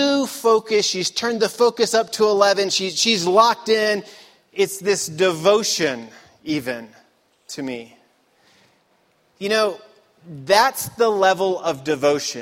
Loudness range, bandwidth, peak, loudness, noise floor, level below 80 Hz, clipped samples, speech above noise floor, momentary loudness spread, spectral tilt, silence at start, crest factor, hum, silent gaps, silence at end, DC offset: 10 LU; 16.5 kHz; -2 dBFS; -19 LUFS; -62 dBFS; -66 dBFS; under 0.1%; 42 dB; 14 LU; -2.5 dB/octave; 0 s; 18 dB; none; none; 0 s; under 0.1%